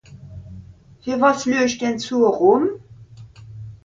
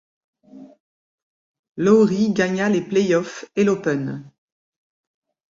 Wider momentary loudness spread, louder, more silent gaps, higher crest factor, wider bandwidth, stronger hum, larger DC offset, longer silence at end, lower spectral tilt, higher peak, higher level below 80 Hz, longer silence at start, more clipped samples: first, 24 LU vs 13 LU; about the same, -18 LUFS vs -19 LUFS; second, none vs 0.80-1.64 s, 1.71-1.75 s; about the same, 20 dB vs 18 dB; about the same, 7.6 kHz vs 7.6 kHz; neither; neither; second, 0.1 s vs 1.3 s; second, -5 dB/octave vs -6.5 dB/octave; about the same, -2 dBFS vs -4 dBFS; first, -52 dBFS vs -64 dBFS; second, 0.1 s vs 0.55 s; neither